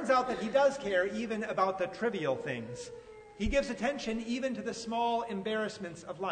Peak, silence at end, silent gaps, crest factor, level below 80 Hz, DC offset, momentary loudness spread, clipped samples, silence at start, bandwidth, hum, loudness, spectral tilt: -14 dBFS; 0 s; none; 18 dB; -52 dBFS; under 0.1%; 14 LU; under 0.1%; 0 s; 9.6 kHz; none; -33 LUFS; -4.5 dB/octave